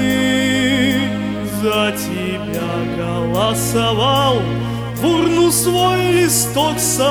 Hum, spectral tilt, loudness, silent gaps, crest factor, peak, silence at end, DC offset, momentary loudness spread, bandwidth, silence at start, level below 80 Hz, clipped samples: none; -4 dB/octave; -16 LUFS; none; 14 dB; -2 dBFS; 0 s; under 0.1%; 8 LU; 19.5 kHz; 0 s; -40 dBFS; under 0.1%